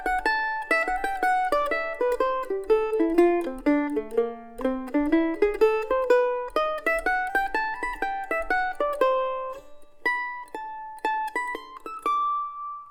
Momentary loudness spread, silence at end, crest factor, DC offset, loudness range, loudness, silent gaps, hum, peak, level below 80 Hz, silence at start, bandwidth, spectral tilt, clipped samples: 10 LU; 0 s; 18 dB; under 0.1%; 5 LU; -25 LUFS; none; none; -8 dBFS; -50 dBFS; 0 s; 18.5 kHz; -4 dB/octave; under 0.1%